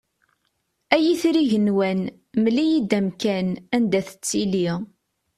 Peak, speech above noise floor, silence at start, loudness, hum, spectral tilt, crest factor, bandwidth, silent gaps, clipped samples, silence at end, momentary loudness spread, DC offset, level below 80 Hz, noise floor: -2 dBFS; 51 dB; 0.9 s; -22 LUFS; none; -5.5 dB/octave; 20 dB; 14 kHz; none; under 0.1%; 0.5 s; 7 LU; under 0.1%; -62 dBFS; -72 dBFS